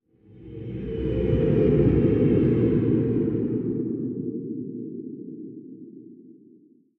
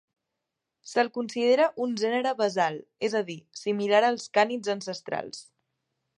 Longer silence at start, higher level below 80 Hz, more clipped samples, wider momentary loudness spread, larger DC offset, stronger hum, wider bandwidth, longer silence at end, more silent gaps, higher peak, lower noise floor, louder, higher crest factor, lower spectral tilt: second, 0.35 s vs 0.85 s; first, -40 dBFS vs -80 dBFS; neither; first, 20 LU vs 11 LU; neither; neither; second, 4 kHz vs 11 kHz; about the same, 0.65 s vs 0.75 s; neither; about the same, -8 dBFS vs -8 dBFS; second, -56 dBFS vs -85 dBFS; first, -24 LUFS vs -27 LUFS; about the same, 16 dB vs 20 dB; first, -12 dB/octave vs -4 dB/octave